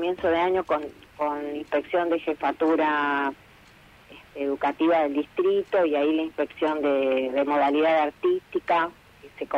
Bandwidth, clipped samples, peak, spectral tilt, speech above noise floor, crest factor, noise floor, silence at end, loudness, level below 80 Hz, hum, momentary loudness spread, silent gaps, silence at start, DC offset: 9.4 kHz; under 0.1%; -12 dBFS; -6 dB/octave; 28 dB; 14 dB; -52 dBFS; 0 s; -25 LUFS; -62 dBFS; none; 8 LU; none; 0 s; under 0.1%